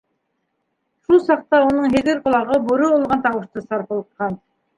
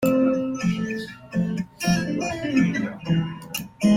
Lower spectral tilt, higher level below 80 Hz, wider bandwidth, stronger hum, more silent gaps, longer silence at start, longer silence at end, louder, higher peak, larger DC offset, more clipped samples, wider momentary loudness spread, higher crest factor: about the same, -6.5 dB/octave vs -6 dB/octave; about the same, -52 dBFS vs -52 dBFS; second, 11 kHz vs 16.5 kHz; neither; neither; first, 1.1 s vs 0 s; first, 0.4 s vs 0 s; first, -18 LUFS vs -25 LUFS; first, -2 dBFS vs -8 dBFS; neither; neither; first, 11 LU vs 8 LU; about the same, 16 dB vs 16 dB